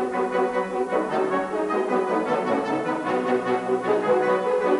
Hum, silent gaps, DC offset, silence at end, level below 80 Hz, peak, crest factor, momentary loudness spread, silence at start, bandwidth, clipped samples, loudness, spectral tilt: none; none; under 0.1%; 0 s; -62 dBFS; -10 dBFS; 14 dB; 4 LU; 0 s; 11.5 kHz; under 0.1%; -24 LUFS; -6 dB/octave